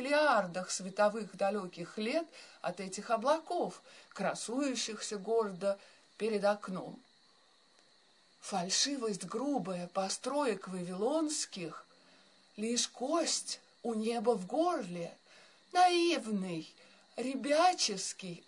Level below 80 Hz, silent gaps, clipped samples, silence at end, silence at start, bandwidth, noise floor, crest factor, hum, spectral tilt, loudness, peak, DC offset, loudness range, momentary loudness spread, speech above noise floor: -90 dBFS; none; under 0.1%; 0.1 s; 0 s; 11 kHz; -67 dBFS; 20 dB; none; -3 dB/octave; -34 LUFS; -16 dBFS; under 0.1%; 4 LU; 14 LU; 33 dB